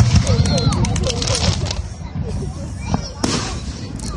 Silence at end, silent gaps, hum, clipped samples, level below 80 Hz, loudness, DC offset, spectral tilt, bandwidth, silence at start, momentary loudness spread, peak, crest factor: 0 s; none; none; under 0.1%; -28 dBFS; -20 LUFS; under 0.1%; -5 dB/octave; 11.5 kHz; 0 s; 12 LU; 0 dBFS; 18 dB